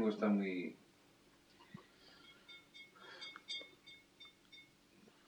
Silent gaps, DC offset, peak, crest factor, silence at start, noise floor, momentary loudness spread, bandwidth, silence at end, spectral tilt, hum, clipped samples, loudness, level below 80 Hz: none; under 0.1%; -24 dBFS; 20 dB; 0 s; -68 dBFS; 26 LU; 19 kHz; 0.65 s; -6 dB/octave; none; under 0.1%; -42 LUFS; -86 dBFS